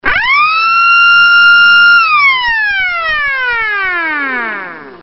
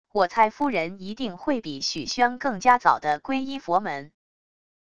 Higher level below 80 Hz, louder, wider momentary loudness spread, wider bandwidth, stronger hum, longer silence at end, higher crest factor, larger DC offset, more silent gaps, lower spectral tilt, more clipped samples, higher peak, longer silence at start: first, -40 dBFS vs -60 dBFS; first, -7 LUFS vs -24 LUFS; about the same, 11 LU vs 12 LU; second, 6 kHz vs 10 kHz; neither; second, 0.05 s vs 0.7 s; second, 10 dB vs 22 dB; second, under 0.1% vs 0.5%; neither; about the same, -2.5 dB/octave vs -3.5 dB/octave; first, 0.1% vs under 0.1%; first, 0 dBFS vs -4 dBFS; about the same, 0.05 s vs 0.05 s